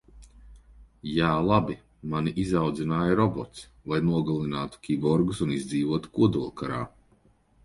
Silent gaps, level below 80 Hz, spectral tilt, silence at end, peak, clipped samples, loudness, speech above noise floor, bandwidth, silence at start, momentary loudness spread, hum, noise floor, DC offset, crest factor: none; -50 dBFS; -7 dB/octave; 0.75 s; -8 dBFS; under 0.1%; -27 LUFS; 36 dB; 11.5 kHz; 0.15 s; 11 LU; none; -62 dBFS; under 0.1%; 20 dB